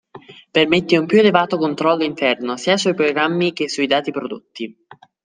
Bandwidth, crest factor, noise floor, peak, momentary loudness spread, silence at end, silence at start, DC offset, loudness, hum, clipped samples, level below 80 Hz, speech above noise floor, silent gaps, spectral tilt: 9.8 kHz; 16 dB; -42 dBFS; -2 dBFS; 15 LU; 0.55 s; 0.15 s; under 0.1%; -17 LUFS; none; under 0.1%; -62 dBFS; 24 dB; none; -5 dB/octave